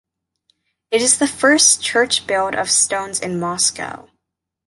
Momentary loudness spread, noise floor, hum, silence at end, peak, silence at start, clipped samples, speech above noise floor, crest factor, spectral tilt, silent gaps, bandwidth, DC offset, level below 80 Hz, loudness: 11 LU; -79 dBFS; none; 0.7 s; 0 dBFS; 0.9 s; under 0.1%; 62 dB; 18 dB; -1 dB/octave; none; 12 kHz; under 0.1%; -58 dBFS; -15 LUFS